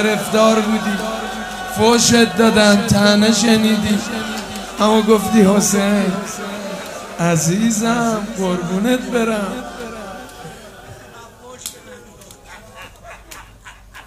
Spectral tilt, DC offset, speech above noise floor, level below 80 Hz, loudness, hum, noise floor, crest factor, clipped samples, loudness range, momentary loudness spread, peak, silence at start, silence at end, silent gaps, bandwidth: -4 dB/octave; under 0.1%; 26 dB; -46 dBFS; -15 LUFS; none; -41 dBFS; 16 dB; under 0.1%; 21 LU; 21 LU; 0 dBFS; 0 s; 0.05 s; none; 16 kHz